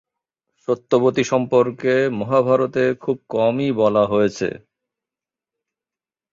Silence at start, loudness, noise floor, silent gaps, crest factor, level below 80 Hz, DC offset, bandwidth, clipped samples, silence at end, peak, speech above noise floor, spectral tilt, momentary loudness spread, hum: 0.7 s; -19 LUFS; under -90 dBFS; none; 18 dB; -60 dBFS; under 0.1%; 7.6 kHz; under 0.1%; 1.75 s; -2 dBFS; over 72 dB; -6.5 dB/octave; 8 LU; none